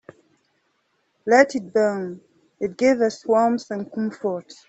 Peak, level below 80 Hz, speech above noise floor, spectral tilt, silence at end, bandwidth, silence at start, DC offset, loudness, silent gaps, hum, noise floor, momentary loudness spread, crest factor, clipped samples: -2 dBFS; -68 dBFS; 48 dB; -5 dB/octave; 0.15 s; 8.2 kHz; 1.25 s; under 0.1%; -21 LUFS; none; none; -69 dBFS; 14 LU; 20 dB; under 0.1%